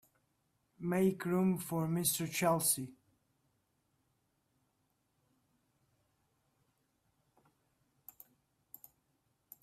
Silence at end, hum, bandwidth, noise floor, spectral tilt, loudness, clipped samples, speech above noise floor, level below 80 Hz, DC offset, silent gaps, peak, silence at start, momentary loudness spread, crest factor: 6.7 s; none; 16 kHz; -80 dBFS; -4.5 dB/octave; -33 LUFS; under 0.1%; 46 dB; -76 dBFS; under 0.1%; none; -18 dBFS; 0.8 s; 6 LU; 22 dB